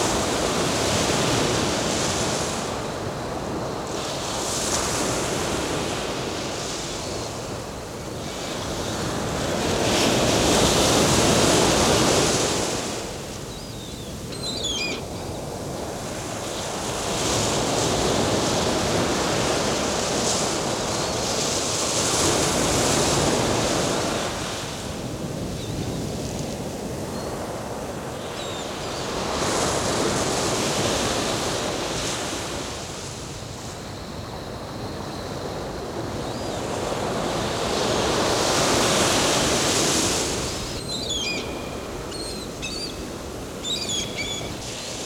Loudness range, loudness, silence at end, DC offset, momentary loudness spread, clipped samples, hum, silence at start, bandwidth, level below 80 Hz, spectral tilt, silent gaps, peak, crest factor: 10 LU; -24 LUFS; 0 s; under 0.1%; 13 LU; under 0.1%; none; 0 s; 18 kHz; -42 dBFS; -3 dB/octave; none; -6 dBFS; 18 dB